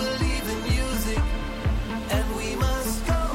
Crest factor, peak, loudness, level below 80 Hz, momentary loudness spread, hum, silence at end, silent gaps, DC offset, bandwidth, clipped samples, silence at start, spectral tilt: 12 dB; -12 dBFS; -27 LUFS; -28 dBFS; 3 LU; none; 0 s; none; under 0.1%; 16.5 kHz; under 0.1%; 0 s; -5 dB/octave